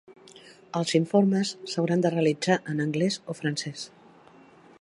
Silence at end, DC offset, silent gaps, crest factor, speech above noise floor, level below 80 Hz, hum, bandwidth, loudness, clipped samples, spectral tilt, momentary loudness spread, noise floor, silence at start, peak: 0.95 s; under 0.1%; none; 18 dB; 28 dB; -74 dBFS; none; 11.5 kHz; -26 LUFS; under 0.1%; -5.5 dB/octave; 11 LU; -53 dBFS; 0.1 s; -8 dBFS